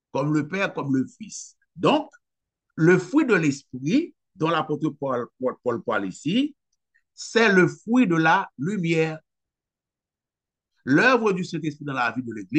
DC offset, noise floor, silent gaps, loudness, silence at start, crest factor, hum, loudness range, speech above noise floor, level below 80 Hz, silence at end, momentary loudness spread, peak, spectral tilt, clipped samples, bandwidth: under 0.1%; -90 dBFS; none; -23 LUFS; 0.15 s; 18 dB; none; 4 LU; 67 dB; -72 dBFS; 0 s; 14 LU; -6 dBFS; -6 dB/octave; under 0.1%; 9 kHz